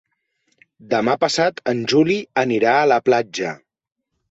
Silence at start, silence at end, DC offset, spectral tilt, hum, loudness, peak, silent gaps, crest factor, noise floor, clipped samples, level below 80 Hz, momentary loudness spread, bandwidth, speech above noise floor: 0.9 s; 0.75 s; under 0.1%; -4.5 dB/octave; none; -18 LUFS; -4 dBFS; none; 16 dB; -68 dBFS; under 0.1%; -62 dBFS; 10 LU; 8 kHz; 51 dB